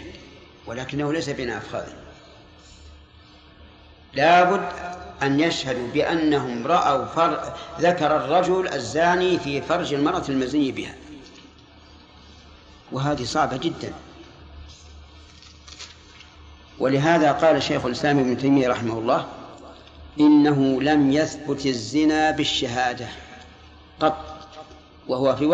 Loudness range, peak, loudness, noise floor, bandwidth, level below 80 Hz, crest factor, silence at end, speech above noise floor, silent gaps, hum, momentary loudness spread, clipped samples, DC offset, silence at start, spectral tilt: 9 LU; -6 dBFS; -22 LUFS; -49 dBFS; 8.6 kHz; -50 dBFS; 18 dB; 0 s; 28 dB; none; none; 22 LU; under 0.1%; under 0.1%; 0 s; -5.5 dB/octave